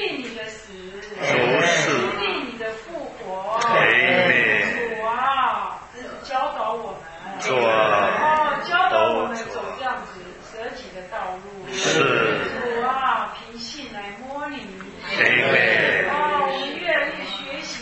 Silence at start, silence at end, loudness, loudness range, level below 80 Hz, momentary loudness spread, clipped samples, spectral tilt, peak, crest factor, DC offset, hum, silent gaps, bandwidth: 0 s; 0 s; -20 LUFS; 5 LU; -56 dBFS; 18 LU; under 0.1%; -3 dB/octave; 0 dBFS; 22 dB; under 0.1%; none; none; 8.4 kHz